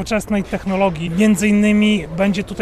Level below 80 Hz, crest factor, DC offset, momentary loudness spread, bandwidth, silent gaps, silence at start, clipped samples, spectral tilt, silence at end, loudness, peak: -38 dBFS; 12 dB; under 0.1%; 7 LU; 13.5 kHz; none; 0 s; under 0.1%; -5.5 dB/octave; 0 s; -17 LUFS; -4 dBFS